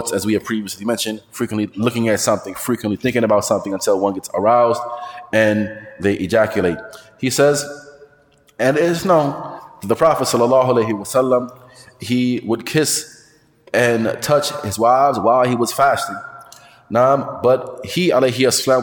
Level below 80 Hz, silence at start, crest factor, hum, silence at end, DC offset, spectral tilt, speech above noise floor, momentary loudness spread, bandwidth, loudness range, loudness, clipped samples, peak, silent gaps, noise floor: -56 dBFS; 0 s; 16 dB; none; 0 s; under 0.1%; -4.5 dB/octave; 36 dB; 10 LU; 19 kHz; 3 LU; -17 LUFS; under 0.1%; -2 dBFS; none; -53 dBFS